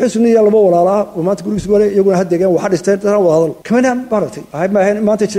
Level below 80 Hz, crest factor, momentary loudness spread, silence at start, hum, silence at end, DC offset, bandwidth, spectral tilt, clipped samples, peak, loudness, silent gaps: -46 dBFS; 10 dB; 8 LU; 0 s; none; 0 s; under 0.1%; 13.5 kHz; -6.5 dB/octave; under 0.1%; -2 dBFS; -13 LUFS; none